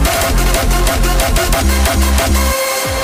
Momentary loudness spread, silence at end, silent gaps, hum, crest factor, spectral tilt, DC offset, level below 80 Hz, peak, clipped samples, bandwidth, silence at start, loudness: 1 LU; 0 s; none; none; 12 dB; -3.5 dB/octave; under 0.1%; -14 dBFS; 0 dBFS; under 0.1%; 16.5 kHz; 0 s; -13 LUFS